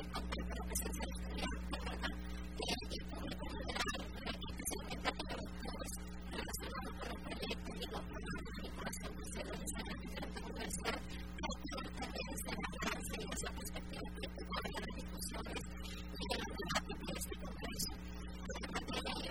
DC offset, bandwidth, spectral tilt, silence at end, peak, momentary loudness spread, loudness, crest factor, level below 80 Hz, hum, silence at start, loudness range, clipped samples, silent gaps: 0.2%; 19.5 kHz; -3.5 dB/octave; 0 s; -22 dBFS; 6 LU; -44 LUFS; 22 dB; -48 dBFS; none; 0 s; 2 LU; under 0.1%; none